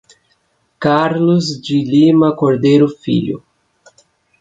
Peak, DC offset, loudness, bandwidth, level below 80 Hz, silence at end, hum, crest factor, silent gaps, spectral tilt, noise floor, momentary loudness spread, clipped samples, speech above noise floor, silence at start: -2 dBFS; under 0.1%; -14 LUFS; 7.8 kHz; -56 dBFS; 1 s; none; 14 dB; none; -7 dB/octave; -61 dBFS; 8 LU; under 0.1%; 49 dB; 0.8 s